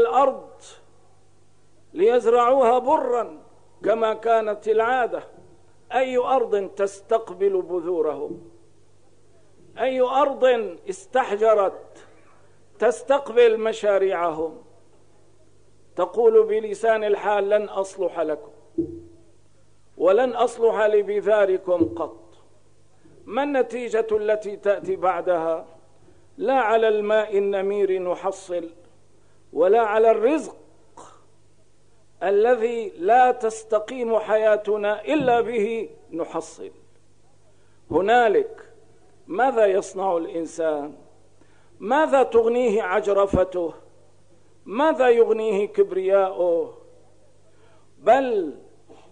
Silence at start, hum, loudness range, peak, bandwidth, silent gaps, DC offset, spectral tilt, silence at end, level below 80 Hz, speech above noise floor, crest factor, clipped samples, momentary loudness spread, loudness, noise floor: 0 s; 50 Hz at -65 dBFS; 4 LU; -6 dBFS; 10 kHz; none; 0.3%; -5 dB/octave; 0.55 s; -58 dBFS; 39 dB; 16 dB; under 0.1%; 13 LU; -22 LUFS; -60 dBFS